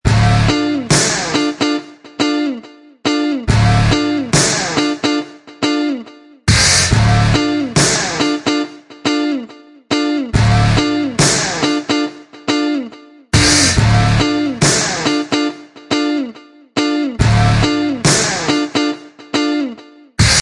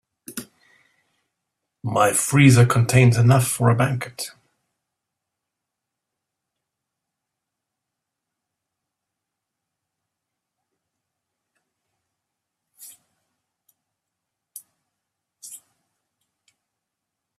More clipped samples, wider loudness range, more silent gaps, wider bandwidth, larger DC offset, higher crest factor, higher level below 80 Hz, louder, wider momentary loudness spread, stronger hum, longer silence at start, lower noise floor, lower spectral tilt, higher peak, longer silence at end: neither; second, 3 LU vs 13 LU; neither; second, 11.5 kHz vs 14.5 kHz; neither; second, 14 dB vs 24 dB; first, -30 dBFS vs -56 dBFS; first, -14 LUFS vs -17 LUFS; second, 10 LU vs 22 LU; neither; second, 0.05 s vs 0.3 s; second, -36 dBFS vs -83 dBFS; second, -4 dB/octave vs -5.5 dB/octave; about the same, 0 dBFS vs -2 dBFS; second, 0 s vs 1.8 s